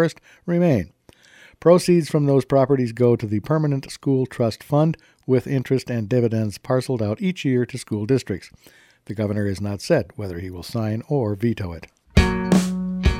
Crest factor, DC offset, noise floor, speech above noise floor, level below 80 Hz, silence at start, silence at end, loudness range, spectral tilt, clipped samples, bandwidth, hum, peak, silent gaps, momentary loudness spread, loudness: 20 dB; under 0.1%; -51 dBFS; 30 dB; -36 dBFS; 0 s; 0 s; 6 LU; -7 dB/octave; under 0.1%; 16 kHz; none; -2 dBFS; none; 12 LU; -21 LUFS